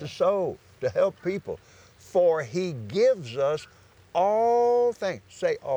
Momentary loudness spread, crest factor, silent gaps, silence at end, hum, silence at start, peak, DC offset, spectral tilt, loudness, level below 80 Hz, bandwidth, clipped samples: 11 LU; 14 dB; none; 0 s; none; 0 s; -12 dBFS; under 0.1%; -6 dB/octave; -26 LUFS; -66 dBFS; over 20 kHz; under 0.1%